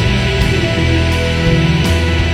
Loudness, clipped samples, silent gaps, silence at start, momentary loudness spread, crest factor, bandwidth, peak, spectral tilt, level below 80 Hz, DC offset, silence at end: -13 LUFS; under 0.1%; none; 0 s; 1 LU; 12 dB; 14.5 kHz; 0 dBFS; -5.5 dB/octave; -20 dBFS; under 0.1%; 0 s